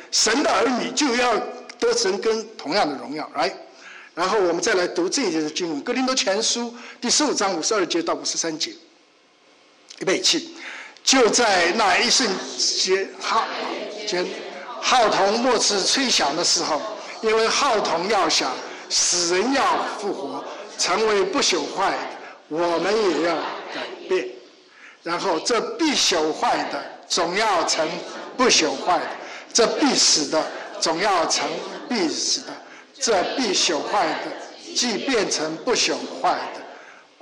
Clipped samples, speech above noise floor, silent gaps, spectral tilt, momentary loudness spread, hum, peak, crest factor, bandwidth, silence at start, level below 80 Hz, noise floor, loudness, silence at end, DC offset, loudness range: under 0.1%; 35 dB; none; -1.5 dB/octave; 14 LU; none; -8 dBFS; 14 dB; 12 kHz; 0 s; -60 dBFS; -56 dBFS; -21 LUFS; 0.25 s; under 0.1%; 4 LU